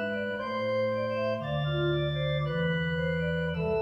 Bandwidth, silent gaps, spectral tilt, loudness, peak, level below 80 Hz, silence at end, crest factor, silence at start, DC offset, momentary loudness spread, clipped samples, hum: 7.4 kHz; none; -8 dB/octave; -30 LUFS; -18 dBFS; -52 dBFS; 0 s; 12 dB; 0 s; under 0.1%; 3 LU; under 0.1%; none